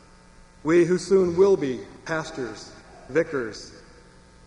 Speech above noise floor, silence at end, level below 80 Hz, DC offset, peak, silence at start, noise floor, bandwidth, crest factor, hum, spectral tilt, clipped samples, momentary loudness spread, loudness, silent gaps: 28 dB; 0.65 s; -54 dBFS; under 0.1%; -8 dBFS; 0.65 s; -51 dBFS; 10.5 kHz; 16 dB; none; -6 dB/octave; under 0.1%; 20 LU; -24 LUFS; none